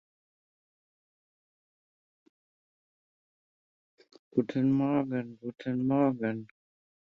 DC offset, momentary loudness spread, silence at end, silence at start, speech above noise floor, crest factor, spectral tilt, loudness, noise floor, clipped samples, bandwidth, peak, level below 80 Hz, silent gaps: under 0.1%; 11 LU; 0.6 s; 4.35 s; over 61 dB; 22 dB; -9.5 dB/octave; -30 LUFS; under -90 dBFS; under 0.1%; 5.2 kHz; -12 dBFS; -72 dBFS; none